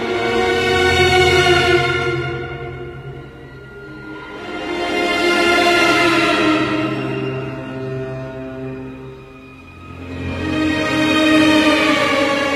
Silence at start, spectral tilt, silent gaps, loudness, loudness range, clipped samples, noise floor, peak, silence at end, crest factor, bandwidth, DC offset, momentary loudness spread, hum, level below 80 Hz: 0 s; -4.5 dB/octave; none; -15 LUFS; 10 LU; under 0.1%; -38 dBFS; -2 dBFS; 0 s; 16 dB; 15 kHz; under 0.1%; 21 LU; none; -42 dBFS